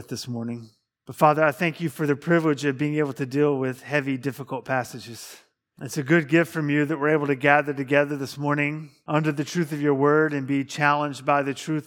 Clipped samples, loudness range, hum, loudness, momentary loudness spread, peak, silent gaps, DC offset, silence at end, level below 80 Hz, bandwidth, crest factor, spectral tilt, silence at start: under 0.1%; 4 LU; none; -23 LUFS; 13 LU; -2 dBFS; none; under 0.1%; 0.05 s; -74 dBFS; 18 kHz; 22 dB; -6 dB/octave; 0 s